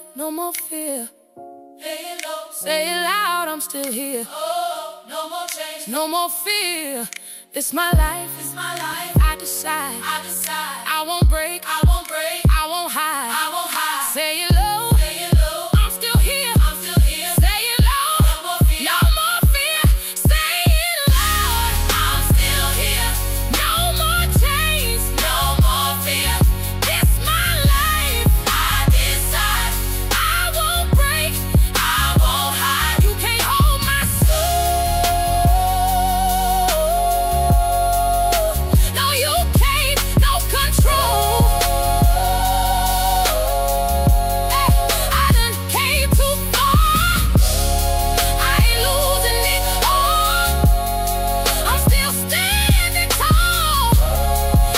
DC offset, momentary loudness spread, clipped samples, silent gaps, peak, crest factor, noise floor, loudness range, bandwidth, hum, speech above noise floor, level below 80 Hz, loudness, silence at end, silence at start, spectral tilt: under 0.1%; 8 LU; under 0.1%; none; -4 dBFS; 12 dB; -41 dBFS; 6 LU; 16.5 kHz; none; 20 dB; -20 dBFS; -17 LUFS; 0 s; 0 s; -3.5 dB/octave